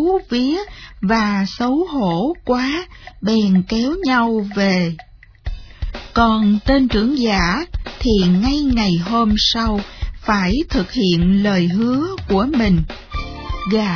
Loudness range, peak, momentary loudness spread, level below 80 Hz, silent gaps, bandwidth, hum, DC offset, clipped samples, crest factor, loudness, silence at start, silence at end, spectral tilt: 3 LU; -2 dBFS; 13 LU; -30 dBFS; none; 5.4 kHz; none; under 0.1%; under 0.1%; 16 dB; -17 LUFS; 0 s; 0 s; -6 dB/octave